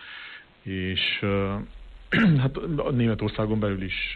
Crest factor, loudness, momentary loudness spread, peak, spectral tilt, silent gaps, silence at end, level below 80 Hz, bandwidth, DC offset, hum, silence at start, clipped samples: 14 dB; -25 LUFS; 18 LU; -12 dBFS; -8.5 dB/octave; none; 0 s; -44 dBFS; 4.9 kHz; under 0.1%; none; 0 s; under 0.1%